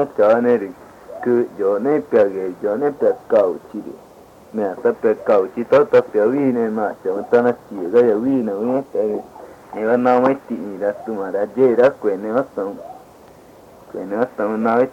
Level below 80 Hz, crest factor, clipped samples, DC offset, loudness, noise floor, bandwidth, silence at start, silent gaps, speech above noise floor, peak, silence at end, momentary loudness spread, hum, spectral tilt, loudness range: -62 dBFS; 16 dB; under 0.1%; under 0.1%; -18 LUFS; -44 dBFS; 8.4 kHz; 0 s; none; 27 dB; -2 dBFS; 0 s; 13 LU; none; -8 dB/octave; 3 LU